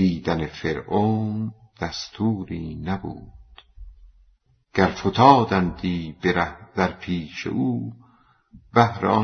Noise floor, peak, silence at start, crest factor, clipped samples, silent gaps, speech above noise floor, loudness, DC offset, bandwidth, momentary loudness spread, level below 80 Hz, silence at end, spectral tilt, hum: -61 dBFS; 0 dBFS; 0 s; 22 dB; under 0.1%; none; 39 dB; -23 LUFS; under 0.1%; 6.6 kHz; 13 LU; -48 dBFS; 0 s; -7 dB/octave; none